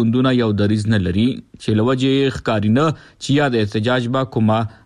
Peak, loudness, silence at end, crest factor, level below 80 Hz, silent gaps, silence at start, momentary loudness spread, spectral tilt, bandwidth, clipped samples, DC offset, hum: -6 dBFS; -18 LUFS; 0.15 s; 10 dB; -46 dBFS; none; 0 s; 5 LU; -7 dB/octave; 10.5 kHz; under 0.1%; under 0.1%; none